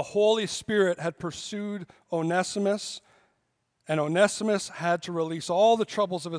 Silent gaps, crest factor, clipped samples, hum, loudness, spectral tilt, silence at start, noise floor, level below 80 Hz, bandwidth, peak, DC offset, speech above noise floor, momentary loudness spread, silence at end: none; 20 dB; under 0.1%; none; -27 LUFS; -4.5 dB/octave; 0 s; -75 dBFS; -70 dBFS; 10.5 kHz; -8 dBFS; under 0.1%; 49 dB; 11 LU; 0 s